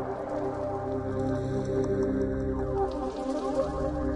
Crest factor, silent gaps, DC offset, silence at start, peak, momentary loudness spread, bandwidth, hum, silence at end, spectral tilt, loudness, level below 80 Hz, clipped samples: 14 dB; none; under 0.1%; 0 s; -16 dBFS; 4 LU; 10.5 kHz; none; 0 s; -8 dB/octave; -30 LUFS; -42 dBFS; under 0.1%